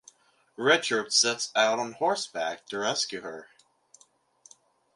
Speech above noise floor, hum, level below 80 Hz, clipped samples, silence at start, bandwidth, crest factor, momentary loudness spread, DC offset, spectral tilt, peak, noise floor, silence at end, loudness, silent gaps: 36 dB; none; -80 dBFS; under 0.1%; 0.6 s; 11.5 kHz; 22 dB; 10 LU; under 0.1%; -1 dB/octave; -8 dBFS; -63 dBFS; 1.5 s; -26 LUFS; none